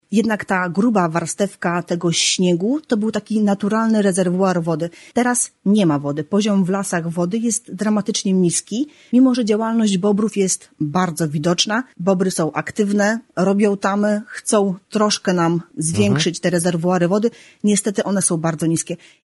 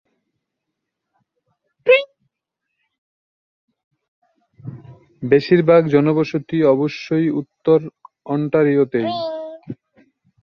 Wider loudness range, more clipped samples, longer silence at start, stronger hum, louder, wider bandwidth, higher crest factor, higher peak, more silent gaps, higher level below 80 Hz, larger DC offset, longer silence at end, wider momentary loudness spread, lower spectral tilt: second, 1 LU vs 7 LU; neither; second, 0.1 s vs 1.85 s; neither; about the same, -18 LUFS vs -17 LUFS; first, 11.5 kHz vs 6.6 kHz; about the same, 16 dB vs 18 dB; about the same, -2 dBFS vs -2 dBFS; second, none vs 2.98-3.68 s, 3.84-3.91 s, 4.08-4.22 s; about the same, -60 dBFS vs -62 dBFS; neither; second, 0.3 s vs 0.7 s; second, 5 LU vs 23 LU; second, -4.5 dB/octave vs -8 dB/octave